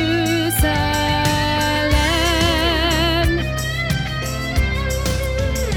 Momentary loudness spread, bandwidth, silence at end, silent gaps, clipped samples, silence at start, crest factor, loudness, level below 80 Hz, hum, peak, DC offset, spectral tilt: 5 LU; 19.5 kHz; 0 s; none; under 0.1%; 0 s; 14 dB; -18 LUFS; -24 dBFS; none; -4 dBFS; under 0.1%; -4.5 dB/octave